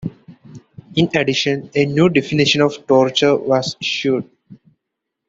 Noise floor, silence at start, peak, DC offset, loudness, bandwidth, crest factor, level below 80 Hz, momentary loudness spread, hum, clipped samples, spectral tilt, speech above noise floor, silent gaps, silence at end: -79 dBFS; 0 s; 0 dBFS; under 0.1%; -16 LUFS; 7.8 kHz; 18 dB; -54 dBFS; 6 LU; none; under 0.1%; -5 dB/octave; 63 dB; none; 0.75 s